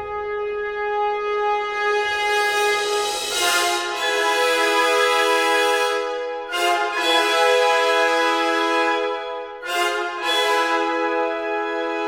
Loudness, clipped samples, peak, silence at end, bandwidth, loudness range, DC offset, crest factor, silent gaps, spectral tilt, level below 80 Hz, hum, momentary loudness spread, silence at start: -20 LUFS; under 0.1%; -4 dBFS; 0 s; 19.5 kHz; 3 LU; under 0.1%; 16 dB; none; 0 dB/octave; -58 dBFS; none; 8 LU; 0 s